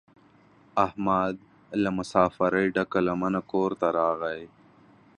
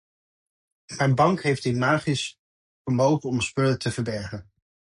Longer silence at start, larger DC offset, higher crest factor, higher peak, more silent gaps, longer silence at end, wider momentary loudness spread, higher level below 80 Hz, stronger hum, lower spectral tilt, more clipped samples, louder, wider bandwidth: second, 0.75 s vs 0.9 s; neither; about the same, 22 dB vs 18 dB; about the same, -4 dBFS vs -6 dBFS; second, none vs 2.39-2.85 s; first, 0.7 s vs 0.55 s; second, 8 LU vs 15 LU; about the same, -58 dBFS vs -56 dBFS; neither; first, -7 dB/octave vs -5.5 dB/octave; neither; about the same, -26 LUFS vs -24 LUFS; about the same, 11 kHz vs 11.5 kHz